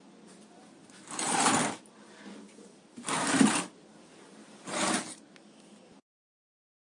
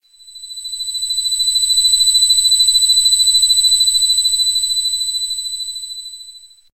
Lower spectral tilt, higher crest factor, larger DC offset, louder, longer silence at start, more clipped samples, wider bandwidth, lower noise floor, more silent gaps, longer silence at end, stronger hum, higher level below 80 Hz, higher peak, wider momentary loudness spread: first, -2.5 dB/octave vs 7 dB/octave; first, 26 dB vs 12 dB; second, under 0.1% vs 0.6%; second, -29 LUFS vs -11 LUFS; about the same, 0.25 s vs 0.25 s; neither; second, 11.5 kHz vs 13 kHz; first, -55 dBFS vs -40 dBFS; neither; first, 1.85 s vs 0.3 s; neither; second, -82 dBFS vs -52 dBFS; second, -8 dBFS vs -4 dBFS; first, 26 LU vs 16 LU